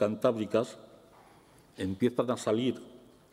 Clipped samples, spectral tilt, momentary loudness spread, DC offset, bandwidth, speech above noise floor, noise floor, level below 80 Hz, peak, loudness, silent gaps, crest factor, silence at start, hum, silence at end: under 0.1%; -6 dB/octave; 14 LU; under 0.1%; 15.5 kHz; 29 dB; -59 dBFS; -72 dBFS; -12 dBFS; -31 LUFS; none; 20 dB; 0 s; none; 0.35 s